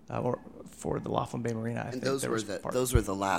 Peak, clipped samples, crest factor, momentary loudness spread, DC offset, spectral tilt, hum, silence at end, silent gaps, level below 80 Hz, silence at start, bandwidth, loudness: -10 dBFS; under 0.1%; 22 dB; 8 LU; 0.1%; -5.5 dB/octave; none; 0 s; none; -42 dBFS; 0.1 s; 16.5 kHz; -32 LUFS